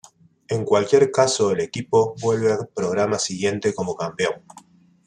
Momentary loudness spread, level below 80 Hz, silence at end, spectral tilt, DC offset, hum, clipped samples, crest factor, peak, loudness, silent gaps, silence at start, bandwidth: 9 LU; -62 dBFS; 0.7 s; -4.5 dB/octave; under 0.1%; none; under 0.1%; 18 dB; -2 dBFS; -21 LUFS; none; 0.5 s; 10.5 kHz